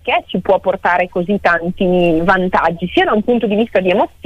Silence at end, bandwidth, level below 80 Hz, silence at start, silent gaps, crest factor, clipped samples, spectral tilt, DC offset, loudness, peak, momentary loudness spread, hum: 0.2 s; 9.6 kHz; -38 dBFS; 0.05 s; none; 12 dB; under 0.1%; -7.5 dB/octave; under 0.1%; -14 LUFS; -2 dBFS; 3 LU; none